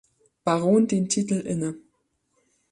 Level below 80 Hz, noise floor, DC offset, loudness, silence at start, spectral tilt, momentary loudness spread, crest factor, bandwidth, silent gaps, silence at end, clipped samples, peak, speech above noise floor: -66 dBFS; -72 dBFS; under 0.1%; -24 LUFS; 0.45 s; -5.5 dB/octave; 11 LU; 16 dB; 11.5 kHz; none; 0.95 s; under 0.1%; -8 dBFS; 49 dB